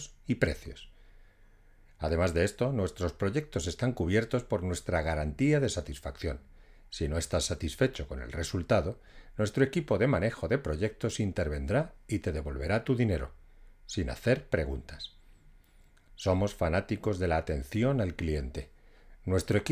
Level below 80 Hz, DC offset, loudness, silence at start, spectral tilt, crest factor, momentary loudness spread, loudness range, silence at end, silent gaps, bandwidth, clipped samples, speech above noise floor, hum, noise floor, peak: -42 dBFS; under 0.1%; -31 LUFS; 0 s; -6 dB/octave; 20 dB; 12 LU; 3 LU; 0 s; none; 15.5 kHz; under 0.1%; 29 dB; none; -59 dBFS; -10 dBFS